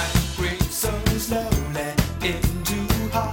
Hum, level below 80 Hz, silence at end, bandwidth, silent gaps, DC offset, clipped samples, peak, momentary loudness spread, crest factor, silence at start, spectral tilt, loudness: none; -30 dBFS; 0 s; 18 kHz; none; under 0.1%; under 0.1%; -4 dBFS; 2 LU; 18 dB; 0 s; -4.5 dB/octave; -24 LUFS